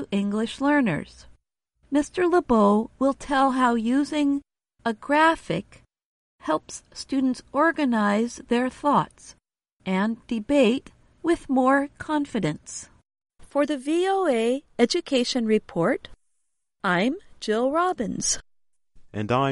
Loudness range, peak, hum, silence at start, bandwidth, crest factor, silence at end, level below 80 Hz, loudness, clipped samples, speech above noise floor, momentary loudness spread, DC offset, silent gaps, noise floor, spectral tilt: 3 LU; -6 dBFS; none; 0 s; 11.5 kHz; 18 dB; 0 s; -54 dBFS; -24 LUFS; under 0.1%; 55 dB; 10 LU; under 0.1%; 6.05-6.38 s, 9.73-9.77 s; -78 dBFS; -4.5 dB/octave